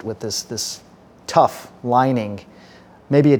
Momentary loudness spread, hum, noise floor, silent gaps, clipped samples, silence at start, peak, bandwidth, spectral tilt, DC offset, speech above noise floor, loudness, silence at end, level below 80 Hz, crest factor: 16 LU; none; -46 dBFS; none; under 0.1%; 0.05 s; -2 dBFS; 19.5 kHz; -5.5 dB/octave; under 0.1%; 27 dB; -20 LUFS; 0 s; -60 dBFS; 20 dB